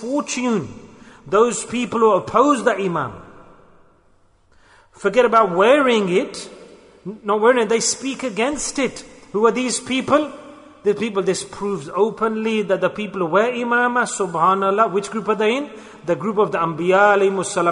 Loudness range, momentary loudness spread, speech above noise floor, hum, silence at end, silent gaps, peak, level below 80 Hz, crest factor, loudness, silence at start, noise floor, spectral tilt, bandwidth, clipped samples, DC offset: 3 LU; 11 LU; 37 dB; none; 0 s; none; -2 dBFS; -56 dBFS; 16 dB; -19 LUFS; 0 s; -56 dBFS; -4 dB/octave; 11 kHz; under 0.1%; under 0.1%